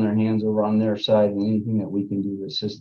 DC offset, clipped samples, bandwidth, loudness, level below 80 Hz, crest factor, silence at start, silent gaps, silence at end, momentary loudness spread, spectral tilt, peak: under 0.1%; under 0.1%; 6.6 kHz; -22 LUFS; -58 dBFS; 14 dB; 0 s; none; 0 s; 8 LU; -8 dB/octave; -8 dBFS